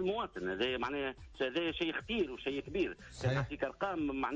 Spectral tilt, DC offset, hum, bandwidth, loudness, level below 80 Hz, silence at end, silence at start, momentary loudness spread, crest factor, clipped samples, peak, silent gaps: -6 dB/octave; under 0.1%; none; 8 kHz; -37 LUFS; -56 dBFS; 0 s; 0 s; 4 LU; 14 dB; under 0.1%; -22 dBFS; none